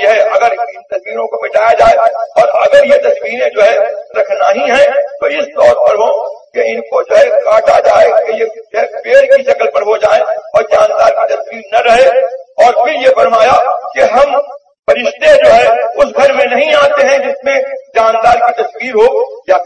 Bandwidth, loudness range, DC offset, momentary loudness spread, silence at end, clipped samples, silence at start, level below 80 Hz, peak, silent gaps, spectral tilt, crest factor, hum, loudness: 9.4 kHz; 2 LU; under 0.1%; 9 LU; 0 s; 0.8%; 0 s; -46 dBFS; 0 dBFS; none; -3 dB/octave; 10 dB; none; -9 LUFS